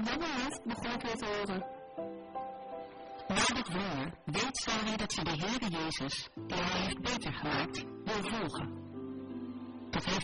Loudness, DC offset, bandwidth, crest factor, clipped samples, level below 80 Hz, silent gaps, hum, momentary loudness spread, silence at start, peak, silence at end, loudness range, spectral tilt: -36 LUFS; under 0.1%; 10.5 kHz; 22 dB; under 0.1%; -56 dBFS; none; none; 11 LU; 0 s; -16 dBFS; 0 s; 4 LU; -3.5 dB/octave